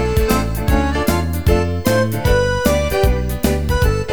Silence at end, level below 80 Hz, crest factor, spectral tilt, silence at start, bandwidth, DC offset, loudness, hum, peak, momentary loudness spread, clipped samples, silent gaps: 0 s; -20 dBFS; 16 dB; -6 dB/octave; 0 s; over 20 kHz; 2%; -17 LUFS; none; 0 dBFS; 2 LU; under 0.1%; none